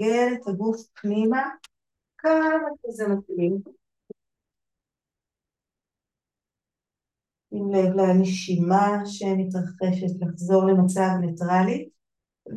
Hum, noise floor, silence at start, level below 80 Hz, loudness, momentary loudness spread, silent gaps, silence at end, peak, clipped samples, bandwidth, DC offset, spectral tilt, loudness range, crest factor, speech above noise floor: none; -89 dBFS; 0 s; -72 dBFS; -23 LUFS; 10 LU; none; 0 s; -6 dBFS; under 0.1%; 11.5 kHz; under 0.1%; -7 dB/octave; 10 LU; 18 dB; 67 dB